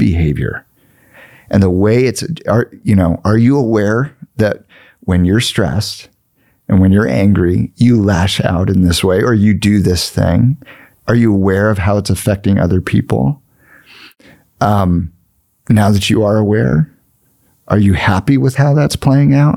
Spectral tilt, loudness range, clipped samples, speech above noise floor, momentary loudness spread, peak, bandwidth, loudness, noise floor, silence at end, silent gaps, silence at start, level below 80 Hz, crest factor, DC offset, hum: -6.5 dB/octave; 4 LU; under 0.1%; 46 dB; 7 LU; 0 dBFS; 15.5 kHz; -13 LUFS; -57 dBFS; 0 s; none; 0 s; -36 dBFS; 12 dB; 0.3%; none